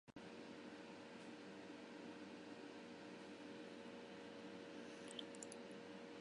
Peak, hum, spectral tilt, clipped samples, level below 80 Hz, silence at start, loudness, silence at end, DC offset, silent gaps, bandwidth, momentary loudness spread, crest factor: -32 dBFS; none; -4 dB/octave; under 0.1%; -88 dBFS; 0.05 s; -56 LUFS; 0 s; under 0.1%; none; 11 kHz; 4 LU; 24 dB